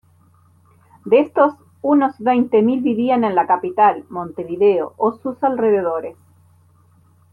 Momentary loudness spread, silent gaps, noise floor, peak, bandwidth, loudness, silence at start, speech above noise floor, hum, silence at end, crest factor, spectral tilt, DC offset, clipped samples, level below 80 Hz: 12 LU; none; -53 dBFS; -2 dBFS; 4.5 kHz; -17 LUFS; 1.05 s; 37 dB; none; 1.2 s; 16 dB; -8.5 dB/octave; under 0.1%; under 0.1%; -64 dBFS